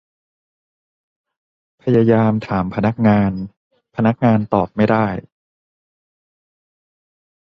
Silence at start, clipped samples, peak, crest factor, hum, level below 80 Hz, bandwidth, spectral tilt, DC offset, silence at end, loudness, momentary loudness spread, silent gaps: 1.85 s; under 0.1%; -2 dBFS; 18 dB; none; -48 dBFS; 5.8 kHz; -10 dB/octave; under 0.1%; 2.4 s; -17 LUFS; 14 LU; 3.57-3.71 s